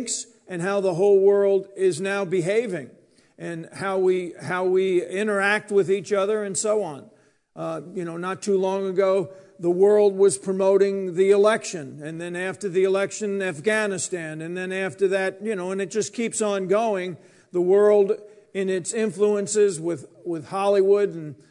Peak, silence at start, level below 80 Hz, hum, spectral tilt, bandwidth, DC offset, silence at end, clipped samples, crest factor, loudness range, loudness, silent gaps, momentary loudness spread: -6 dBFS; 0 s; -78 dBFS; none; -4.5 dB/octave; 11 kHz; under 0.1%; 0.15 s; under 0.1%; 16 dB; 5 LU; -23 LUFS; none; 14 LU